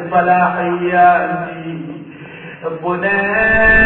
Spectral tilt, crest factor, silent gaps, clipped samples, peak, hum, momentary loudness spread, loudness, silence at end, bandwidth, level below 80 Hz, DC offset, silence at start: -9.5 dB/octave; 14 dB; none; under 0.1%; 0 dBFS; none; 20 LU; -14 LUFS; 0 s; 4.3 kHz; -34 dBFS; under 0.1%; 0 s